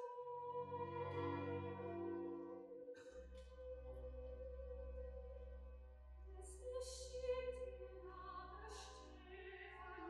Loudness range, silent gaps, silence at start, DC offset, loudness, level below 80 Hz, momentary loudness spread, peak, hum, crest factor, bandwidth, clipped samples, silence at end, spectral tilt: 6 LU; none; 0 s; under 0.1%; -51 LUFS; -60 dBFS; 12 LU; -34 dBFS; none; 16 dB; 12 kHz; under 0.1%; 0 s; -5.5 dB/octave